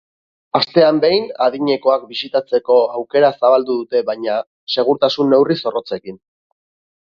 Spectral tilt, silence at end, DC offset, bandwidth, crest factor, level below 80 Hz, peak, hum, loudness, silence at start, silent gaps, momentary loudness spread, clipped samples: -6.5 dB/octave; 0.85 s; under 0.1%; 6.8 kHz; 16 dB; -62 dBFS; 0 dBFS; none; -16 LUFS; 0.55 s; 4.47-4.67 s; 9 LU; under 0.1%